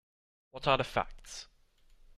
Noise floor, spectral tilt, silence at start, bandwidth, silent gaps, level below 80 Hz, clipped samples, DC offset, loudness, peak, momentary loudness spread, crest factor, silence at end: -63 dBFS; -4 dB/octave; 0.55 s; 14.5 kHz; none; -54 dBFS; under 0.1%; under 0.1%; -32 LUFS; -12 dBFS; 17 LU; 24 dB; 0.05 s